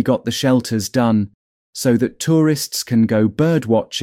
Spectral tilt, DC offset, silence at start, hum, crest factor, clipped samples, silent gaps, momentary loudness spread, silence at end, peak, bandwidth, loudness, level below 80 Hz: -5.5 dB/octave; under 0.1%; 0 s; none; 14 dB; under 0.1%; 1.34-1.73 s; 5 LU; 0 s; -4 dBFS; 16.5 kHz; -17 LUFS; -56 dBFS